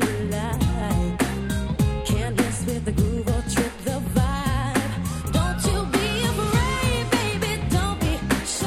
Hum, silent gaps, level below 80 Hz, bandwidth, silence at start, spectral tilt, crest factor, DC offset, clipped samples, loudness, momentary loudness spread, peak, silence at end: none; none; -30 dBFS; 17 kHz; 0 s; -5 dB/octave; 16 dB; under 0.1%; under 0.1%; -24 LUFS; 4 LU; -6 dBFS; 0 s